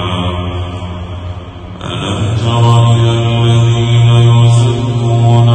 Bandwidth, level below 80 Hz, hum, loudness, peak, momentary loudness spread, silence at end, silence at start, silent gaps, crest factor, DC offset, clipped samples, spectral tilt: 9 kHz; -32 dBFS; none; -10 LUFS; 0 dBFS; 16 LU; 0 s; 0 s; none; 10 dB; under 0.1%; 0.2%; -6.5 dB/octave